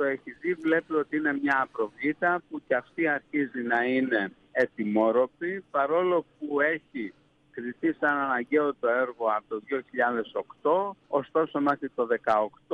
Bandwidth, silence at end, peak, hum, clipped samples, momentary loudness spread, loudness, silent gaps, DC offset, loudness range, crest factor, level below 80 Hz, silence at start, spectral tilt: 7.4 kHz; 0 s; -12 dBFS; none; under 0.1%; 7 LU; -27 LUFS; none; under 0.1%; 2 LU; 16 dB; -74 dBFS; 0 s; -7.5 dB/octave